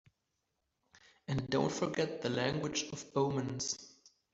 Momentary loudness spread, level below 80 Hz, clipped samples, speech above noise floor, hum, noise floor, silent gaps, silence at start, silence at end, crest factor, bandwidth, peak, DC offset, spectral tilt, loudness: 6 LU; -66 dBFS; under 0.1%; 49 dB; none; -84 dBFS; none; 1.3 s; 0.25 s; 22 dB; 8 kHz; -16 dBFS; under 0.1%; -4.5 dB/octave; -36 LUFS